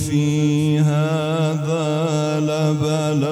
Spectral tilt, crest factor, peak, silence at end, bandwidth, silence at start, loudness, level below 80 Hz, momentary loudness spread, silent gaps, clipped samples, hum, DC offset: -6.5 dB/octave; 12 dB; -6 dBFS; 0 s; 12.5 kHz; 0 s; -19 LUFS; -54 dBFS; 3 LU; none; under 0.1%; none; under 0.1%